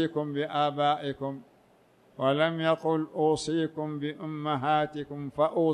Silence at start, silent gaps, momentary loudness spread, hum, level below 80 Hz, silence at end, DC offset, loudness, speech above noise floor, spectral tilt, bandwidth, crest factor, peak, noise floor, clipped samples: 0 s; none; 9 LU; none; -66 dBFS; 0 s; under 0.1%; -29 LUFS; 33 dB; -6 dB/octave; 11 kHz; 16 dB; -12 dBFS; -61 dBFS; under 0.1%